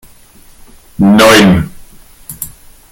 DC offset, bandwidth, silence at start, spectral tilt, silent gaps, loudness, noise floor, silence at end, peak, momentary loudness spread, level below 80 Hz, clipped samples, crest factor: under 0.1%; 17.5 kHz; 1 s; -5 dB/octave; none; -7 LUFS; -39 dBFS; 0.45 s; 0 dBFS; 21 LU; -36 dBFS; 0.3%; 12 dB